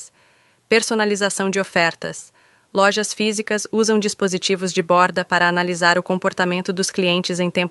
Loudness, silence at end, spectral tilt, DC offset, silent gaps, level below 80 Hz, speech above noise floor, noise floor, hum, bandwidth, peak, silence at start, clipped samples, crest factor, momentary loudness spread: -19 LUFS; 0 s; -3.5 dB/octave; under 0.1%; none; -66 dBFS; 38 dB; -57 dBFS; none; 11.5 kHz; -2 dBFS; 0 s; under 0.1%; 18 dB; 5 LU